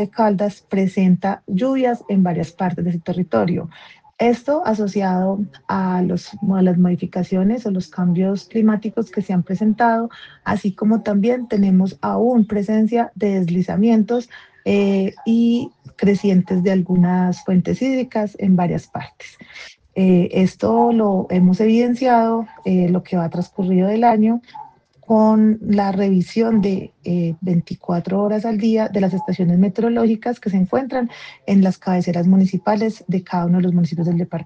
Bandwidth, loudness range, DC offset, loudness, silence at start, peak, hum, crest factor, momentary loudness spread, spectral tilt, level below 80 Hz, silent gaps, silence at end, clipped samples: 7.2 kHz; 3 LU; under 0.1%; -18 LUFS; 0 s; -2 dBFS; none; 16 dB; 8 LU; -8.5 dB/octave; -56 dBFS; none; 0 s; under 0.1%